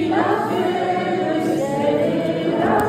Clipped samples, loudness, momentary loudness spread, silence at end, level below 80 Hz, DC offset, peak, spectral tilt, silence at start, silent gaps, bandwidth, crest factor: under 0.1%; -20 LUFS; 2 LU; 0 s; -54 dBFS; under 0.1%; -4 dBFS; -6.5 dB/octave; 0 s; none; 16 kHz; 14 dB